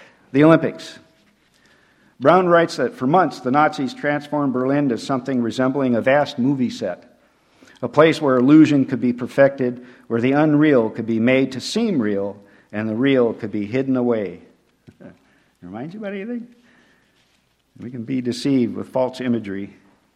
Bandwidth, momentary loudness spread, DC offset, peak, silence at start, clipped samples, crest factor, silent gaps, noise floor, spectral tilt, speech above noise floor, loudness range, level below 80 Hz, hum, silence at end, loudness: 11 kHz; 16 LU; under 0.1%; 0 dBFS; 0.35 s; under 0.1%; 20 dB; none; -63 dBFS; -7 dB/octave; 44 dB; 10 LU; -62 dBFS; none; 0.45 s; -19 LUFS